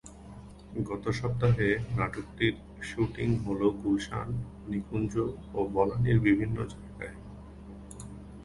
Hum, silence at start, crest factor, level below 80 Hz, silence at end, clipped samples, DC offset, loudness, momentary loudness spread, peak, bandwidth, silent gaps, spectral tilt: none; 0.05 s; 20 dB; -48 dBFS; 0 s; under 0.1%; under 0.1%; -30 LUFS; 21 LU; -10 dBFS; 11.5 kHz; none; -7.5 dB/octave